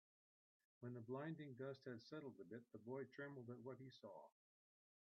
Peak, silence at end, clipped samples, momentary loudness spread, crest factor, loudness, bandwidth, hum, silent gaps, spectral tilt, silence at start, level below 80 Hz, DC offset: -40 dBFS; 0.75 s; under 0.1%; 8 LU; 16 dB; -56 LUFS; 6.2 kHz; none; none; -6 dB/octave; 0.8 s; under -90 dBFS; under 0.1%